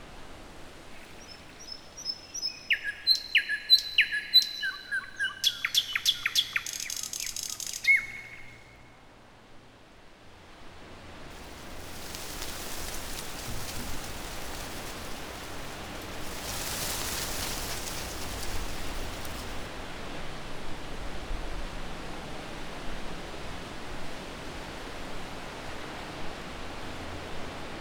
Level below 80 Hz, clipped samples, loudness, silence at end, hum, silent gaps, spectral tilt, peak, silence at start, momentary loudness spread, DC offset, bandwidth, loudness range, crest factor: -44 dBFS; under 0.1%; -31 LUFS; 0 s; none; none; -1 dB/octave; -10 dBFS; 0 s; 21 LU; under 0.1%; over 20 kHz; 15 LU; 24 dB